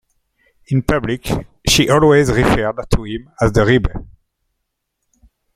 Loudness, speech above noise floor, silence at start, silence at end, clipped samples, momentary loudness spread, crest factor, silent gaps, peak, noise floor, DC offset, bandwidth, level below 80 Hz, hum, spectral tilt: -15 LUFS; 59 dB; 0.7 s; 1.5 s; under 0.1%; 11 LU; 16 dB; none; 0 dBFS; -74 dBFS; under 0.1%; 16 kHz; -30 dBFS; none; -5 dB/octave